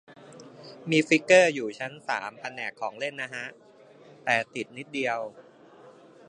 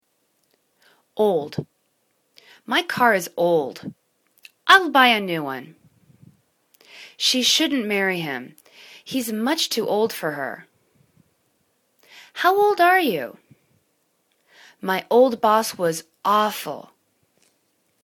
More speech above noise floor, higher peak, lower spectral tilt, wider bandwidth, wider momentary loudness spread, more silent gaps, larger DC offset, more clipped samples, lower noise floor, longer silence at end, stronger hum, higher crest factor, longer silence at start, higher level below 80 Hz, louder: second, 26 dB vs 48 dB; second, -4 dBFS vs 0 dBFS; about the same, -4 dB/octave vs -3 dB/octave; second, 10.5 kHz vs 19 kHz; first, 21 LU vs 18 LU; neither; neither; neither; second, -53 dBFS vs -69 dBFS; second, 0.4 s vs 1.25 s; neither; about the same, 24 dB vs 24 dB; second, 0.1 s vs 1.15 s; second, -78 dBFS vs -70 dBFS; second, -26 LUFS vs -20 LUFS